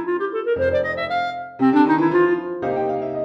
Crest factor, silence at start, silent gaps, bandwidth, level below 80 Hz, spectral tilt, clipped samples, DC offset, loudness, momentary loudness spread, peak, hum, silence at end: 16 dB; 0 s; none; 6.2 kHz; -52 dBFS; -8 dB/octave; under 0.1%; under 0.1%; -20 LUFS; 8 LU; -4 dBFS; none; 0 s